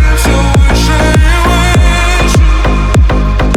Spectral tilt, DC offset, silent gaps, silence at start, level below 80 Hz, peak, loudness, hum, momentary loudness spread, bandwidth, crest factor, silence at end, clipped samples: -5 dB/octave; under 0.1%; none; 0 s; -10 dBFS; 0 dBFS; -9 LUFS; none; 2 LU; 14 kHz; 6 dB; 0 s; under 0.1%